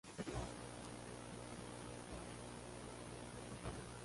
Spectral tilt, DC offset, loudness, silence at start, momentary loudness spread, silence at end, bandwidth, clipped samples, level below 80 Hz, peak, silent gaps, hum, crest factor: -4.5 dB/octave; under 0.1%; -51 LUFS; 0.05 s; 4 LU; 0 s; 11.5 kHz; under 0.1%; -60 dBFS; -32 dBFS; none; 60 Hz at -60 dBFS; 18 dB